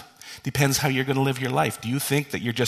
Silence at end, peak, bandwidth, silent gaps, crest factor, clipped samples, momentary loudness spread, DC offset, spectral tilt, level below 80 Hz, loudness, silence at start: 0 s; -4 dBFS; 14 kHz; none; 20 dB; under 0.1%; 8 LU; under 0.1%; -4.5 dB/octave; -54 dBFS; -24 LUFS; 0 s